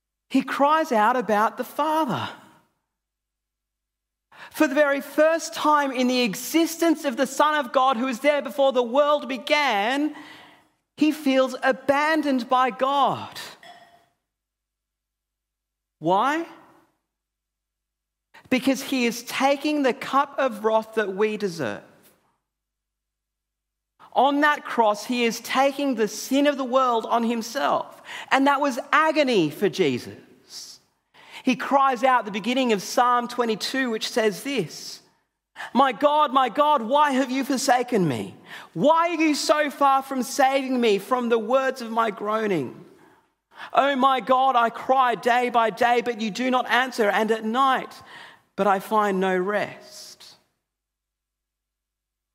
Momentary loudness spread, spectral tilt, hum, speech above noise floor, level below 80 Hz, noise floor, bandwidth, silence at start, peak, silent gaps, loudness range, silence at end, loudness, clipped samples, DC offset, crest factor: 10 LU; -4 dB/octave; 50 Hz at -70 dBFS; 62 dB; -78 dBFS; -84 dBFS; 16 kHz; 0.3 s; -2 dBFS; none; 7 LU; 2.05 s; -22 LUFS; under 0.1%; under 0.1%; 20 dB